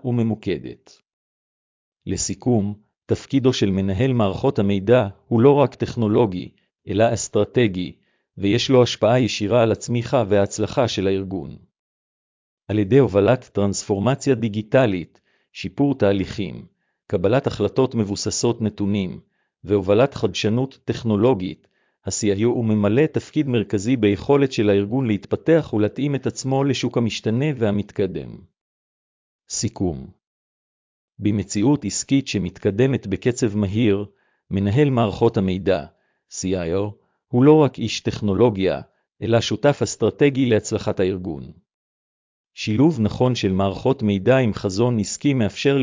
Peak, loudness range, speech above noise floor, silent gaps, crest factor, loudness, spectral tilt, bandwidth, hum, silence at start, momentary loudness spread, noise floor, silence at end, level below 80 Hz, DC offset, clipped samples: -2 dBFS; 4 LU; over 70 dB; 1.13-1.92 s, 11.79-12.57 s, 28.61-29.39 s, 30.27-31.08 s, 41.74-42.51 s; 18 dB; -20 LUFS; -6 dB/octave; 7.6 kHz; none; 0.05 s; 11 LU; under -90 dBFS; 0 s; -46 dBFS; under 0.1%; under 0.1%